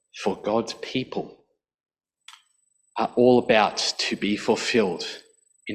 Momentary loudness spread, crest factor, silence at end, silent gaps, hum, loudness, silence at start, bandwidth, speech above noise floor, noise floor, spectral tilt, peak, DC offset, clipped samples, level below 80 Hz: 16 LU; 20 dB; 0 s; 1.80-1.84 s; none; -23 LUFS; 0.15 s; 12 kHz; 45 dB; -68 dBFS; -4 dB/octave; -6 dBFS; under 0.1%; under 0.1%; -62 dBFS